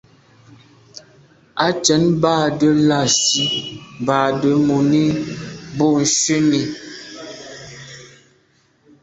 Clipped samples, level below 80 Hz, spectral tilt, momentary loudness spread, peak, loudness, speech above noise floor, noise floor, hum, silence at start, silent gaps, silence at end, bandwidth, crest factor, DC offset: under 0.1%; -54 dBFS; -4 dB/octave; 19 LU; -2 dBFS; -16 LUFS; 42 dB; -58 dBFS; none; 0.95 s; none; 0.95 s; 8.4 kHz; 18 dB; under 0.1%